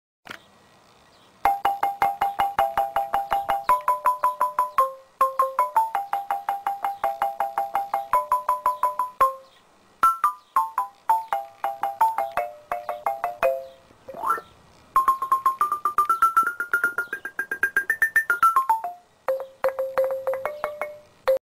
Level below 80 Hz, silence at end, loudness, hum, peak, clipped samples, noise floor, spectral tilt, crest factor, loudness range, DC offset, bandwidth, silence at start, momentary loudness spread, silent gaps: -58 dBFS; 0.05 s; -24 LUFS; none; -6 dBFS; under 0.1%; -56 dBFS; -2.5 dB/octave; 18 dB; 4 LU; under 0.1%; 16.5 kHz; 0.3 s; 10 LU; none